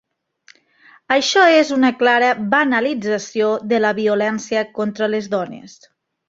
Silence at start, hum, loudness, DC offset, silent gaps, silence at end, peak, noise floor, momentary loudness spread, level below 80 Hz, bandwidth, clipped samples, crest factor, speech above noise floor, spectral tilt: 1.1 s; none; -17 LUFS; under 0.1%; none; 0.6 s; -2 dBFS; -53 dBFS; 10 LU; -64 dBFS; 7.8 kHz; under 0.1%; 16 dB; 36 dB; -4 dB/octave